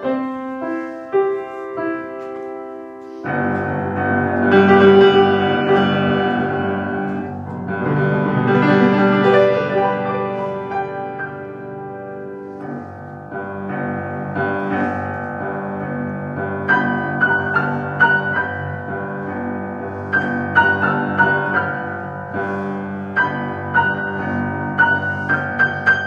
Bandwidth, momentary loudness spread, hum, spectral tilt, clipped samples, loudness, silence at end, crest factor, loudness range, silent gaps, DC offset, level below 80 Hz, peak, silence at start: 6.8 kHz; 15 LU; none; -8 dB/octave; under 0.1%; -18 LUFS; 0 s; 18 dB; 10 LU; none; under 0.1%; -58 dBFS; 0 dBFS; 0 s